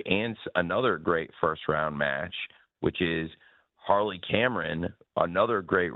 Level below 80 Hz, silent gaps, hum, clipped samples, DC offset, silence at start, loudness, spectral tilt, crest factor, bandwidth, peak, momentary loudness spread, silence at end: -56 dBFS; none; none; under 0.1%; under 0.1%; 0 s; -28 LUFS; -8.5 dB/octave; 20 dB; 4.3 kHz; -8 dBFS; 8 LU; 0 s